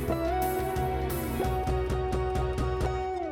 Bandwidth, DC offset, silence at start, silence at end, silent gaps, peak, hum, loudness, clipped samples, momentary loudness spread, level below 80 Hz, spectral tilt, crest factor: 18 kHz; under 0.1%; 0 s; 0 s; none; -18 dBFS; none; -30 LUFS; under 0.1%; 2 LU; -34 dBFS; -6.5 dB/octave; 12 dB